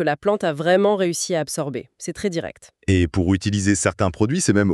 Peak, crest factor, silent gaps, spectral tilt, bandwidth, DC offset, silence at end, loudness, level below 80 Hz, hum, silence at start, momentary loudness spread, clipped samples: -4 dBFS; 18 dB; none; -5 dB/octave; 13 kHz; under 0.1%; 0 s; -21 LUFS; -44 dBFS; none; 0 s; 11 LU; under 0.1%